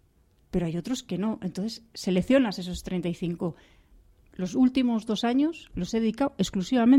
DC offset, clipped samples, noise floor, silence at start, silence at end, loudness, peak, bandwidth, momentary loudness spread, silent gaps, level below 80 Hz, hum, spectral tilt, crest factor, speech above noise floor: under 0.1%; under 0.1%; -63 dBFS; 0.55 s; 0 s; -28 LUFS; -10 dBFS; 13 kHz; 11 LU; none; -50 dBFS; none; -6 dB/octave; 18 dB; 37 dB